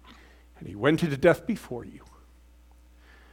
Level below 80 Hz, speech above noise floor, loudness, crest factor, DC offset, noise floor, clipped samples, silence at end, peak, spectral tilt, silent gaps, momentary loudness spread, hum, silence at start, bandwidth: -54 dBFS; 29 dB; -25 LUFS; 24 dB; under 0.1%; -55 dBFS; under 0.1%; 1.35 s; -6 dBFS; -6.5 dB/octave; none; 22 LU; 60 Hz at -50 dBFS; 0.6 s; 17 kHz